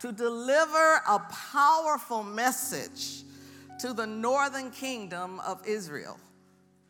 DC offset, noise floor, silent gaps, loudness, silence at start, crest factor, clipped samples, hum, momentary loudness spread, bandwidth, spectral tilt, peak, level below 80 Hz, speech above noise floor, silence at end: under 0.1%; -62 dBFS; none; -28 LUFS; 0 s; 20 dB; under 0.1%; none; 15 LU; 18 kHz; -2.5 dB/octave; -10 dBFS; -86 dBFS; 34 dB; 0.7 s